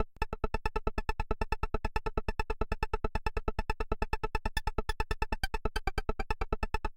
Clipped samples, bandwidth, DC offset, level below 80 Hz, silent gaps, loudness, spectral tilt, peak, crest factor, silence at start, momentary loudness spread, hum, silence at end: under 0.1%; 16.5 kHz; under 0.1%; -36 dBFS; none; -37 LUFS; -5.5 dB/octave; -12 dBFS; 20 dB; 0 s; 2 LU; none; 0.05 s